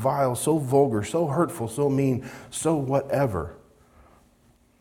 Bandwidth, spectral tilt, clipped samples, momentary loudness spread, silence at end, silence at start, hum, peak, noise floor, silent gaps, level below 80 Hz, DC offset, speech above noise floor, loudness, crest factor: 18 kHz; -6.5 dB/octave; under 0.1%; 8 LU; 1.25 s; 0 s; none; -8 dBFS; -60 dBFS; none; -56 dBFS; under 0.1%; 36 dB; -25 LUFS; 18 dB